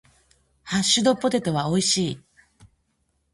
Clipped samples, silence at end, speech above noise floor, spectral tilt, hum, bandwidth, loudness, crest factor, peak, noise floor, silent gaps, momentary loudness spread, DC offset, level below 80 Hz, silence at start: under 0.1%; 1.15 s; 49 dB; -3.5 dB/octave; none; 11.5 kHz; -22 LUFS; 18 dB; -6 dBFS; -71 dBFS; none; 10 LU; under 0.1%; -58 dBFS; 0.65 s